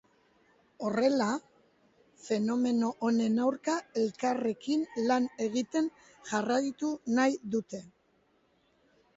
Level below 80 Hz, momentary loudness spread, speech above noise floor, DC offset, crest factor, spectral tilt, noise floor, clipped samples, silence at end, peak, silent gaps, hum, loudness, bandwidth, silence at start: -74 dBFS; 8 LU; 40 dB; under 0.1%; 16 dB; -5 dB/octave; -70 dBFS; under 0.1%; 1.3 s; -14 dBFS; none; none; -31 LUFS; 8 kHz; 0.8 s